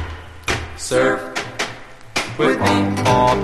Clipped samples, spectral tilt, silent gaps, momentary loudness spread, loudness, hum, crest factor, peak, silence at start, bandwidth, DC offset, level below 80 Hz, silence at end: under 0.1%; -4.5 dB/octave; none; 11 LU; -19 LUFS; none; 16 dB; -2 dBFS; 0 s; 13 kHz; 0.6%; -38 dBFS; 0 s